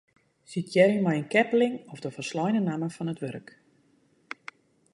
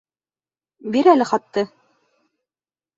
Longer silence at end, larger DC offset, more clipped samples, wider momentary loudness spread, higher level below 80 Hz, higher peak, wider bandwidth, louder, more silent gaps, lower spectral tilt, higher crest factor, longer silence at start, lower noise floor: first, 1.55 s vs 1.3 s; neither; neither; first, 20 LU vs 14 LU; second, -74 dBFS vs -68 dBFS; second, -6 dBFS vs -2 dBFS; first, 11.5 kHz vs 8 kHz; second, -27 LUFS vs -18 LUFS; neither; about the same, -6.5 dB/octave vs -5.5 dB/octave; about the same, 22 dB vs 20 dB; second, 0.5 s vs 0.85 s; second, -65 dBFS vs under -90 dBFS